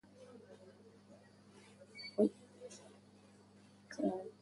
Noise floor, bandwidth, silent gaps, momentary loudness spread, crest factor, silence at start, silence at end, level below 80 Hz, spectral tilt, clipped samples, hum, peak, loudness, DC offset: -63 dBFS; 11.5 kHz; none; 27 LU; 24 dB; 0.2 s; 0.1 s; -82 dBFS; -6 dB/octave; under 0.1%; none; -20 dBFS; -39 LUFS; under 0.1%